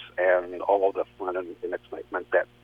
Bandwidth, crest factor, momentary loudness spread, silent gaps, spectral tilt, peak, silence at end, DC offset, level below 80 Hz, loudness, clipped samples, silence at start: 4.8 kHz; 18 dB; 11 LU; none; -6.5 dB/octave; -10 dBFS; 0.2 s; under 0.1%; -64 dBFS; -27 LUFS; under 0.1%; 0 s